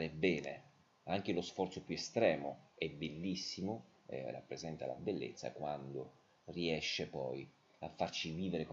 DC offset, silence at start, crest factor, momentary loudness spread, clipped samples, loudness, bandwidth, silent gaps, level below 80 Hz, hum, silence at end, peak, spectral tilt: under 0.1%; 0 s; 22 dB; 13 LU; under 0.1%; -41 LUFS; 7.8 kHz; none; -70 dBFS; none; 0 s; -20 dBFS; -5 dB/octave